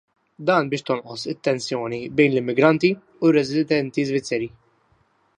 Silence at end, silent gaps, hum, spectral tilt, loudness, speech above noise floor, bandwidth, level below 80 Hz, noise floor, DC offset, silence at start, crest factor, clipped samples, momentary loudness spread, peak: 0.9 s; none; none; -6 dB/octave; -21 LUFS; 42 dB; 10 kHz; -62 dBFS; -63 dBFS; under 0.1%; 0.4 s; 20 dB; under 0.1%; 9 LU; -2 dBFS